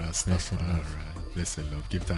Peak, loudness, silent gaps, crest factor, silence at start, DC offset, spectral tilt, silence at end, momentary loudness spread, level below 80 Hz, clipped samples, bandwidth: -14 dBFS; -32 LUFS; none; 16 dB; 0 s; under 0.1%; -4.5 dB/octave; 0 s; 10 LU; -36 dBFS; under 0.1%; 11.5 kHz